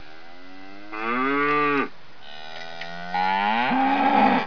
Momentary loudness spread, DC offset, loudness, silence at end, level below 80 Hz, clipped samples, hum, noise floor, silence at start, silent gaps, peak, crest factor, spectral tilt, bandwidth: 22 LU; 2%; -22 LUFS; 0 s; -64 dBFS; under 0.1%; none; -46 dBFS; 0.05 s; none; -8 dBFS; 16 dB; -6 dB/octave; 5.4 kHz